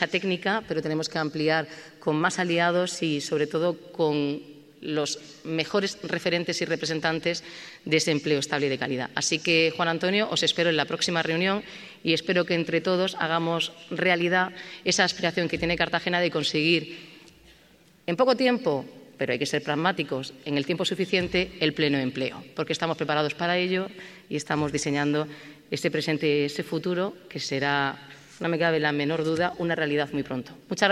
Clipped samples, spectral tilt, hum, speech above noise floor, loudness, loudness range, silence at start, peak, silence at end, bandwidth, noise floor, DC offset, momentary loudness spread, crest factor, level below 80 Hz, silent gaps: under 0.1%; -4 dB/octave; none; 31 dB; -26 LUFS; 4 LU; 0 s; -4 dBFS; 0 s; 14 kHz; -57 dBFS; under 0.1%; 9 LU; 24 dB; -60 dBFS; none